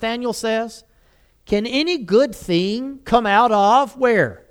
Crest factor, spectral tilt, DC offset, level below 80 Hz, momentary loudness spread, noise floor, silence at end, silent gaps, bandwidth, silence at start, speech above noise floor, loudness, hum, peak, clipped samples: 16 dB; -5 dB/octave; under 0.1%; -48 dBFS; 9 LU; -56 dBFS; 0.15 s; none; 17 kHz; 0 s; 38 dB; -18 LUFS; none; -2 dBFS; under 0.1%